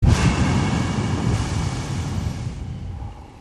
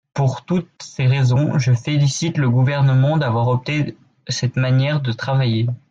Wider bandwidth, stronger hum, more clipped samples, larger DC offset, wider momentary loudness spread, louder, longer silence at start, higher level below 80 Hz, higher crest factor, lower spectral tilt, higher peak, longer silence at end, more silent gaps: first, 12 kHz vs 7.8 kHz; neither; neither; neither; first, 14 LU vs 7 LU; second, -23 LUFS vs -18 LUFS; second, 0 s vs 0.15 s; first, -28 dBFS vs -54 dBFS; first, 18 dB vs 10 dB; about the same, -6 dB/octave vs -6.5 dB/octave; first, -4 dBFS vs -8 dBFS; second, 0 s vs 0.15 s; neither